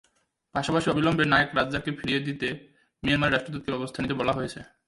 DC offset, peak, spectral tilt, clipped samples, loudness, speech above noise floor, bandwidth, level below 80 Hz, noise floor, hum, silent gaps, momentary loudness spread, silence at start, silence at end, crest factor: under 0.1%; -6 dBFS; -5.5 dB/octave; under 0.1%; -26 LUFS; 43 dB; 11.5 kHz; -52 dBFS; -69 dBFS; none; none; 11 LU; 0.55 s; 0.2 s; 20 dB